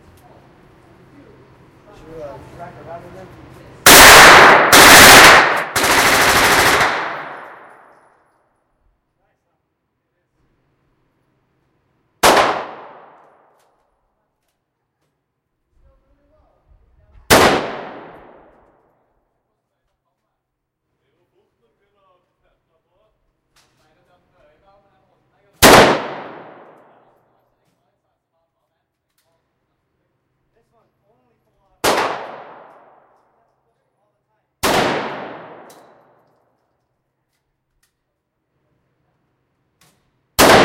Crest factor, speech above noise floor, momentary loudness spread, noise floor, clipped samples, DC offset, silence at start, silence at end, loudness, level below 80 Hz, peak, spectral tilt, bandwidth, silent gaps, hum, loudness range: 16 dB; 41 dB; 31 LU; -76 dBFS; 0.4%; under 0.1%; 2.15 s; 0 s; -8 LUFS; -42 dBFS; 0 dBFS; -1.5 dB/octave; 17 kHz; none; none; 20 LU